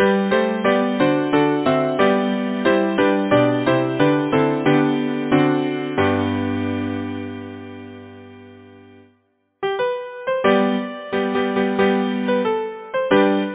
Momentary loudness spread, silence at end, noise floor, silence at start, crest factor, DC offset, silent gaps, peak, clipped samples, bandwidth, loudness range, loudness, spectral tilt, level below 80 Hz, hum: 10 LU; 0 s; -64 dBFS; 0 s; 16 dB; under 0.1%; none; -2 dBFS; under 0.1%; 4 kHz; 11 LU; -19 LUFS; -10.5 dB/octave; -50 dBFS; none